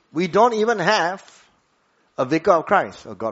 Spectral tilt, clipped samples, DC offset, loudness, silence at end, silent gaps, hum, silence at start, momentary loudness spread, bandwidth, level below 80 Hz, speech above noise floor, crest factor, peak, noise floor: -3 dB/octave; under 0.1%; under 0.1%; -19 LUFS; 0 s; none; none; 0.15 s; 14 LU; 8 kHz; -62 dBFS; 44 dB; 20 dB; -2 dBFS; -64 dBFS